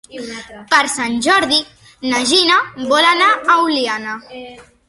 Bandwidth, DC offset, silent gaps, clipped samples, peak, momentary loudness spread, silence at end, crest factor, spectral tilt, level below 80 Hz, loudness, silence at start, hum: 11.5 kHz; under 0.1%; none; under 0.1%; 0 dBFS; 18 LU; 0.25 s; 16 dB; -1.5 dB/octave; -54 dBFS; -14 LUFS; 0.1 s; none